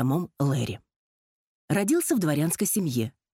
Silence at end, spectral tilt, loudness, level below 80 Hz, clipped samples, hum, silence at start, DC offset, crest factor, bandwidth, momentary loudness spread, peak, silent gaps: 0.25 s; -5.5 dB/octave; -26 LUFS; -64 dBFS; under 0.1%; none; 0 s; under 0.1%; 16 dB; 16.5 kHz; 7 LU; -12 dBFS; 0.96-1.68 s